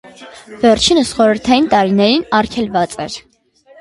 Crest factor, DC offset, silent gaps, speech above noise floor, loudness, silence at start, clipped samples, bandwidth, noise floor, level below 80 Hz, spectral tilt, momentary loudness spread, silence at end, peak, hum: 14 dB; under 0.1%; none; 33 dB; -13 LUFS; 0.2 s; under 0.1%; 11.5 kHz; -47 dBFS; -42 dBFS; -4 dB/octave; 13 LU; 0.6 s; 0 dBFS; none